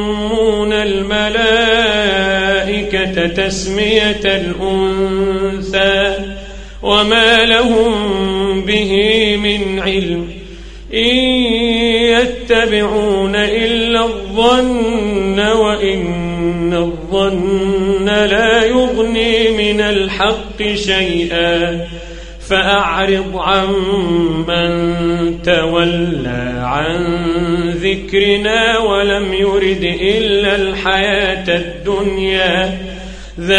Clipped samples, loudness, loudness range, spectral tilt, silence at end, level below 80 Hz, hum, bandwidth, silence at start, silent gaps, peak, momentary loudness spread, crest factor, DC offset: under 0.1%; -13 LUFS; 3 LU; -4.5 dB/octave; 0 s; -30 dBFS; none; 11 kHz; 0 s; none; 0 dBFS; 7 LU; 14 dB; under 0.1%